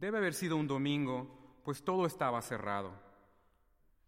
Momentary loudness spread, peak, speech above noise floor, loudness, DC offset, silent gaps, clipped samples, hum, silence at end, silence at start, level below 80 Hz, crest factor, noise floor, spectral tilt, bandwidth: 10 LU; -20 dBFS; 35 dB; -36 LUFS; under 0.1%; none; under 0.1%; none; 1 s; 0 s; -70 dBFS; 18 dB; -70 dBFS; -5.5 dB/octave; 16.5 kHz